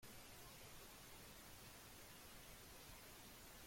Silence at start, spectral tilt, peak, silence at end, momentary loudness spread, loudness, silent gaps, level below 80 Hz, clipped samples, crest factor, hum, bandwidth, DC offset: 0 s; -2.5 dB/octave; -48 dBFS; 0 s; 0 LU; -59 LUFS; none; -70 dBFS; under 0.1%; 12 dB; none; 16.5 kHz; under 0.1%